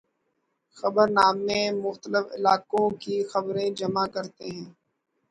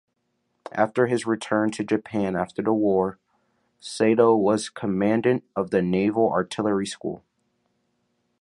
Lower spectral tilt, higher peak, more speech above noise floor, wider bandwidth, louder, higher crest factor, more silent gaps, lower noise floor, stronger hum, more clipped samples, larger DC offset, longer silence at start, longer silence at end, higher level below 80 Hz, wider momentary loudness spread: about the same, -5 dB/octave vs -6 dB/octave; about the same, -6 dBFS vs -4 dBFS; about the same, 51 dB vs 51 dB; about the same, 11 kHz vs 11.5 kHz; about the same, -25 LUFS vs -23 LUFS; about the same, 20 dB vs 20 dB; neither; about the same, -76 dBFS vs -74 dBFS; neither; neither; neither; about the same, 0.75 s vs 0.75 s; second, 0.6 s vs 1.25 s; second, -66 dBFS vs -60 dBFS; first, 15 LU vs 11 LU